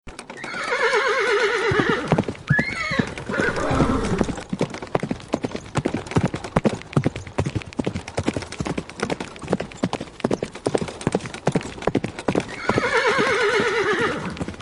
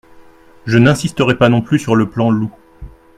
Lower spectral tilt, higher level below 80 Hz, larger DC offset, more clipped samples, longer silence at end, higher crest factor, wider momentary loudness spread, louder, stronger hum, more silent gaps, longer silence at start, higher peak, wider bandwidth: about the same, -5.5 dB/octave vs -6.5 dB/octave; about the same, -42 dBFS vs -42 dBFS; neither; neither; second, 0 s vs 0.3 s; first, 22 dB vs 14 dB; about the same, 9 LU vs 7 LU; second, -23 LUFS vs -14 LUFS; neither; neither; second, 0.05 s vs 0.65 s; about the same, 0 dBFS vs 0 dBFS; second, 11.5 kHz vs 13.5 kHz